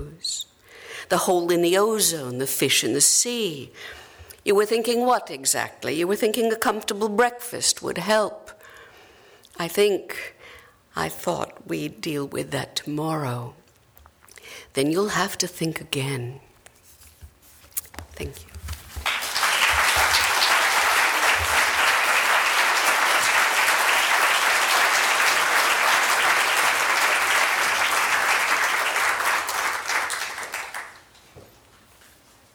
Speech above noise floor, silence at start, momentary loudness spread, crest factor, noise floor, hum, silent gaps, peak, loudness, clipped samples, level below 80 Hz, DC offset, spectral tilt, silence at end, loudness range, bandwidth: 30 dB; 0 s; 15 LU; 18 dB; -54 dBFS; none; none; -6 dBFS; -21 LUFS; under 0.1%; -52 dBFS; under 0.1%; -2 dB/octave; 1.15 s; 11 LU; over 20 kHz